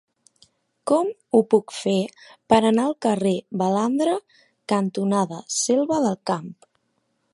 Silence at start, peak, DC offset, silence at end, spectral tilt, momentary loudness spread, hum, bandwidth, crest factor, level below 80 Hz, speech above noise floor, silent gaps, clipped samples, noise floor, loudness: 0.85 s; -2 dBFS; under 0.1%; 0.8 s; -5 dB/octave; 9 LU; none; 11.5 kHz; 20 dB; -64 dBFS; 50 dB; none; under 0.1%; -71 dBFS; -22 LUFS